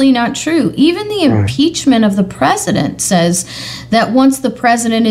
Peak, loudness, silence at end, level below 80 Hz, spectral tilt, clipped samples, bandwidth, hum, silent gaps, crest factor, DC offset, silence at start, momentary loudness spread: 0 dBFS; -12 LUFS; 0 s; -44 dBFS; -4.5 dB/octave; under 0.1%; 15.5 kHz; none; none; 12 dB; under 0.1%; 0 s; 4 LU